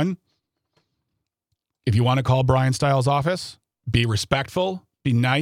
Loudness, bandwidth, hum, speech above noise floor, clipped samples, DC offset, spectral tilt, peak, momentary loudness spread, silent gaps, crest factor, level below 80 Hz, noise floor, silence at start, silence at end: -22 LUFS; 14.5 kHz; none; 59 dB; under 0.1%; under 0.1%; -6 dB/octave; -4 dBFS; 10 LU; none; 18 dB; -48 dBFS; -79 dBFS; 0 s; 0 s